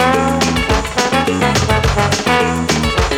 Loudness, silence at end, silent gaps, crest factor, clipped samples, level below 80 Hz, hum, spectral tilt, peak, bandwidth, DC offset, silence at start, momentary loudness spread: -14 LUFS; 0 s; none; 14 dB; under 0.1%; -24 dBFS; none; -4.5 dB/octave; 0 dBFS; 19 kHz; under 0.1%; 0 s; 2 LU